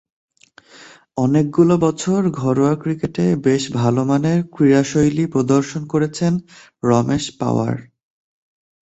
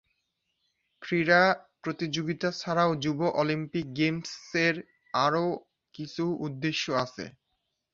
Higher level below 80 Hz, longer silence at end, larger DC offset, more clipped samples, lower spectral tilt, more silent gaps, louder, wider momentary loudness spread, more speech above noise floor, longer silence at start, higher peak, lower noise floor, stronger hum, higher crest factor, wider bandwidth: first, -50 dBFS vs -68 dBFS; first, 1 s vs 0.65 s; neither; neither; first, -7 dB/octave vs -5.5 dB/octave; neither; first, -18 LUFS vs -28 LUFS; second, 7 LU vs 14 LU; second, 31 dB vs 52 dB; second, 0.8 s vs 1 s; first, -2 dBFS vs -8 dBFS; second, -48 dBFS vs -80 dBFS; neither; second, 16 dB vs 22 dB; about the same, 8.2 kHz vs 7.6 kHz